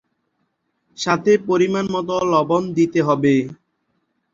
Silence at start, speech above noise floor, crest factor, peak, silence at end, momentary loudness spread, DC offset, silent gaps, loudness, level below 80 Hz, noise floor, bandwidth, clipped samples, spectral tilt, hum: 1 s; 53 dB; 18 dB; -2 dBFS; 0.8 s; 5 LU; under 0.1%; none; -18 LUFS; -60 dBFS; -71 dBFS; 7.6 kHz; under 0.1%; -6 dB/octave; none